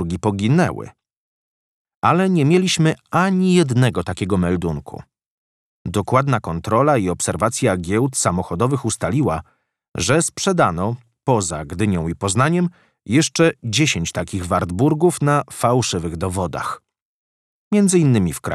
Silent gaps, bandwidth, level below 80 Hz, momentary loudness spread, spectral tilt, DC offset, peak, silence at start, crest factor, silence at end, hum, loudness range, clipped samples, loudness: 1.17-1.85 s, 1.96-2.02 s, 5.26-5.85 s, 9.88-9.92 s, 17.02-17.71 s; 13.5 kHz; -44 dBFS; 10 LU; -5 dB/octave; under 0.1%; -2 dBFS; 0 s; 16 dB; 0 s; none; 3 LU; under 0.1%; -19 LUFS